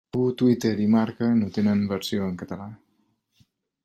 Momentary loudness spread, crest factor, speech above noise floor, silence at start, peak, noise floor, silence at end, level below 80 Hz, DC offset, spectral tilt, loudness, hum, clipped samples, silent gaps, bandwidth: 14 LU; 16 dB; 46 dB; 0.15 s; -8 dBFS; -70 dBFS; 1.1 s; -64 dBFS; under 0.1%; -7 dB/octave; -24 LUFS; none; under 0.1%; none; 15 kHz